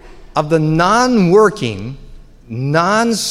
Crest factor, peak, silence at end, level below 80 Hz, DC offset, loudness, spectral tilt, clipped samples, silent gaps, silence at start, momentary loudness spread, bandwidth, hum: 14 dB; -2 dBFS; 0 s; -40 dBFS; under 0.1%; -14 LUFS; -5.5 dB/octave; under 0.1%; none; 0.05 s; 14 LU; 15 kHz; none